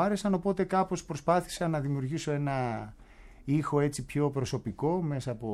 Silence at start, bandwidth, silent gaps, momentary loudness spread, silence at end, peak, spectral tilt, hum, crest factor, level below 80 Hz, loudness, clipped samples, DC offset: 0 s; 13.5 kHz; none; 6 LU; 0 s; -12 dBFS; -6.5 dB/octave; none; 18 dB; -54 dBFS; -31 LUFS; under 0.1%; under 0.1%